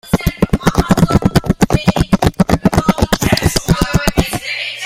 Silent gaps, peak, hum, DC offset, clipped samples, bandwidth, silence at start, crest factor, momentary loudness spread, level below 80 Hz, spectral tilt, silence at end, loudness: none; 0 dBFS; none; under 0.1%; under 0.1%; 16.5 kHz; 0.05 s; 14 dB; 4 LU; -24 dBFS; -5.5 dB/octave; 0 s; -14 LUFS